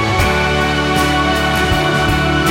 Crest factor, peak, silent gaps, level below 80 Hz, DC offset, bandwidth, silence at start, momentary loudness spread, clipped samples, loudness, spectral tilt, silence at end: 12 dB; -2 dBFS; none; -24 dBFS; under 0.1%; 17 kHz; 0 s; 1 LU; under 0.1%; -14 LUFS; -4.5 dB/octave; 0 s